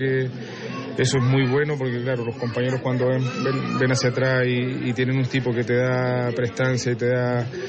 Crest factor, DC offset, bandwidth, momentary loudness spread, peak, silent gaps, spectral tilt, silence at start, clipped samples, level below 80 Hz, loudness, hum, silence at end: 14 dB; under 0.1%; 8.6 kHz; 6 LU; -8 dBFS; none; -6 dB/octave; 0 s; under 0.1%; -58 dBFS; -22 LUFS; none; 0 s